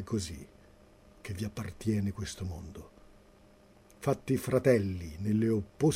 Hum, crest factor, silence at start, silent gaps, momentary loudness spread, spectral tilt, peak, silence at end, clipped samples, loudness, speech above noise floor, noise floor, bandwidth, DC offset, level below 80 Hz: none; 20 dB; 0 s; none; 17 LU; -6.5 dB/octave; -12 dBFS; 0 s; under 0.1%; -32 LUFS; 28 dB; -59 dBFS; 16 kHz; under 0.1%; -54 dBFS